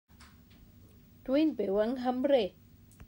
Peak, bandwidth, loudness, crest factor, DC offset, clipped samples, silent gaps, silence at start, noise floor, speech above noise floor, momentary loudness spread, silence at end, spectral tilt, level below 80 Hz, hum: -16 dBFS; 16 kHz; -30 LUFS; 18 dB; under 0.1%; under 0.1%; none; 0.2 s; -57 dBFS; 28 dB; 7 LU; 0.05 s; -7 dB/octave; -62 dBFS; none